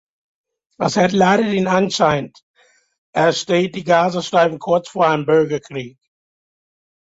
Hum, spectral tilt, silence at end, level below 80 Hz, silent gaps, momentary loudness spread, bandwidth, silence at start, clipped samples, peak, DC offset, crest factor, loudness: none; -5 dB/octave; 1.1 s; -56 dBFS; 2.43-2.54 s, 2.98-3.13 s; 11 LU; 8 kHz; 0.8 s; under 0.1%; -2 dBFS; under 0.1%; 16 dB; -17 LUFS